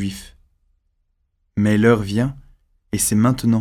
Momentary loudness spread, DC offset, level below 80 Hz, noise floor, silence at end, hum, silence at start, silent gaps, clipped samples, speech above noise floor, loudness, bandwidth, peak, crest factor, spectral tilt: 13 LU; under 0.1%; -44 dBFS; -68 dBFS; 0 s; none; 0 s; none; under 0.1%; 50 dB; -19 LUFS; 16 kHz; -2 dBFS; 18 dB; -5.5 dB/octave